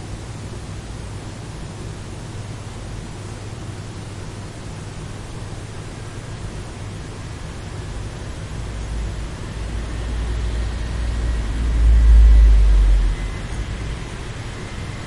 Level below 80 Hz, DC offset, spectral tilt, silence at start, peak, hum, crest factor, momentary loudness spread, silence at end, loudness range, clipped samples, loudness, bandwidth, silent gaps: -20 dBFS; under 0.1%; -6 dB/octave; 0 s; -4 dBFS; none; 16 dB; 16 LU; 0 s; 14 LU; under 0.1%; -24 LUFS; 11 kHz; none